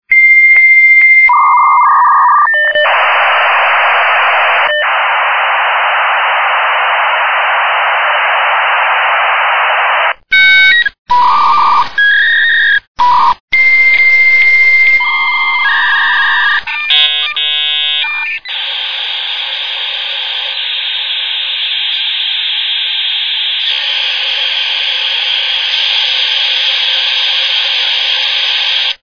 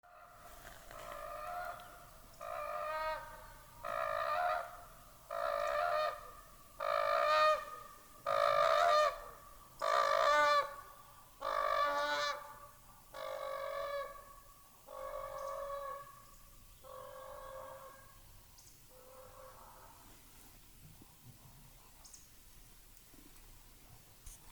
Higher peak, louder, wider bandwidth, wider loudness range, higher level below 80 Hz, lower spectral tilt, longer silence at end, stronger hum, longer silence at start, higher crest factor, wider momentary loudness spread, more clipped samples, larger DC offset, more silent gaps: first, 0 dBFS vs -18 dBFS; first, -8 LUFS vs -36 LUFS; second, 5.4 kHz vs over 20 kHz; second, 6 LU vs 24 LU; first, -50 dBFS vs -64 dBFS; second, 0.5 dB/octave vs -2 dB/octave; about the same, 0 s vs 0 s; neither; about the same, 0.1 s vs 0.05 s; second, 10 dB vs 22 dB; second, 9 LU vs 27 LU; neither; neither; first, 10.99-11.05 s, 12.88-12.95 s, 13.40-13.48 s vs none